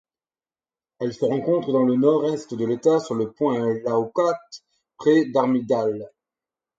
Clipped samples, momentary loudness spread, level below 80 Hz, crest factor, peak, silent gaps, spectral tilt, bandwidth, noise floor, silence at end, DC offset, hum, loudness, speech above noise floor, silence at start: under 0.1%; 9 LU; -70 dBFS; 16 dB; -6 dBFS; none; -7 dB/octave; 7.8 kHz; under -90 dBFS; 0.7 s; under 0.1%; none; -22 LUFS; over 69 dB; 1 s